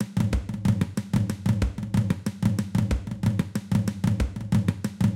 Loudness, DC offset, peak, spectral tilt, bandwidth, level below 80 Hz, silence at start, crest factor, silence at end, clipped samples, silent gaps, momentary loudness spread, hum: -26 LUFS; under 0.1%; -10 dBFS; -7 dB/octave; 16 kHz; -36 dBFS; 0 s; 16 dB; 0 s; under 0.1%; none; 2 LU; none